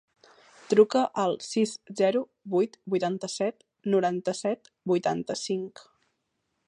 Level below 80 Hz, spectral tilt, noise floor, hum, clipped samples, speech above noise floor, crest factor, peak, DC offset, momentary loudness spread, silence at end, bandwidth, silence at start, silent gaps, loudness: -76 dBFS; -5 dB/octave; -78 dBFS; none; under 0.1%; 52 dB; 20 dB; -8 dBFS; under 0.1%; 9 LU; 0.85 s; 11 kHz; 0.7 s; none; -27 LUFS